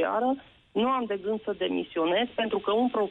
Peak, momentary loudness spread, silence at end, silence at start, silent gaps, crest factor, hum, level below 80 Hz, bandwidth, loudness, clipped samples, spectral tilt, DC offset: -16 dBFS; 5 LU; 0 s; 0 s; none; 10 dB; none; -66 dBFS; 4.1 kHz; -28 LUFS; under 0.1%; -7.5 dB/octave; under 0.1%